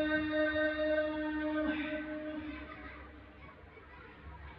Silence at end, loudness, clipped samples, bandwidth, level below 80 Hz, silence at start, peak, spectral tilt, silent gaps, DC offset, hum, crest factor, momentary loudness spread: 0 s; -35 LUFS; under 0.1%; 5.2 kHz; -56 dBFS; 0 s; -22 dBFS; -8.5 dB/octave; none; under 0.1%; none; 14 dB; 21 LU